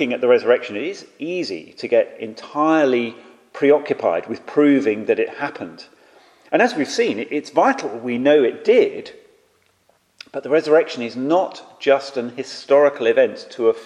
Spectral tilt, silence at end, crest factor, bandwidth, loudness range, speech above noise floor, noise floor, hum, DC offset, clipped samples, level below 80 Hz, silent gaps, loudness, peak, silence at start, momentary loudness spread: -5 dB/octave; 0 s; 18 dB; 10.5 kHz; 3 LU; 43 dB; -61 dBFS; none; under 0.1%; under 0.1%; -74 dBFS; none; -19 LUFS; -2 dBFS; 0 s; 13 LU